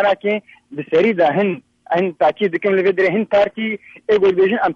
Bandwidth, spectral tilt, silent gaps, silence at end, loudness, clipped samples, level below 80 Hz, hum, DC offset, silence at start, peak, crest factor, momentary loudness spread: 6.8 kHz; -7.5 dB/octave; none; 0 s; -17 LUFS; under 0.1%; -58 dBFS; none; under 0.1%; 0 s; -6 dBFS; 12 dB; 10 LU